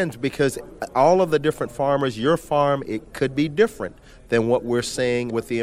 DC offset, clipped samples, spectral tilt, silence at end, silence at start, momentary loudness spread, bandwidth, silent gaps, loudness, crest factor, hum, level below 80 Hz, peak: under 0.1%; under 0.1%; -5.5 dB/octave; 0 s; 0 s; 8 LU; 16 kHz; none; -22 LUFS; 16 dB; none; -50 dBFS; -4 dBFS